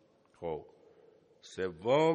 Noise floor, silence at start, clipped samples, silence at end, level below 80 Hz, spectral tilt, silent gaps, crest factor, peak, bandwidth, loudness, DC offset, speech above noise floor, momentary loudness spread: -63 dBFS; 0.4 s; under 0.1%; 0 s; -70 dBFS; -6 dB/octave; none; 20 dB; -16 dBFS; 9.6 kHz; -35 LUFS; under 0.1%; 32 dB; 19 LU